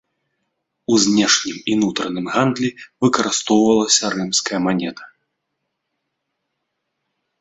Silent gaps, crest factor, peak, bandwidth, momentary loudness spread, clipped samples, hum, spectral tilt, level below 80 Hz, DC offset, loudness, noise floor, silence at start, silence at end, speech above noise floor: none; 20 dB; -2 dBFS; 8.4 kHz; 9 LU; under 0.1%; none; -3 dB/octave; -60 dBFS; under 0.1%; -17 LUFS; -76 dBFS; 0.9 s; 2.35 s; 58 dB